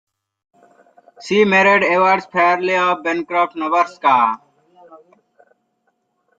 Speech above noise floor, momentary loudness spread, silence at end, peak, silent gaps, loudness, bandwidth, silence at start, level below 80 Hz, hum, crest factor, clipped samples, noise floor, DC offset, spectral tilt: 52 dB; 8 LU; 1.4 s; -2 dBFS; none; -15 LUFS; 7.8 kHz; 1.2 s; -68 dBFS; none; 18 dB; under 0.1%; -68 dBFS; under 0.1%; -5 dB/octave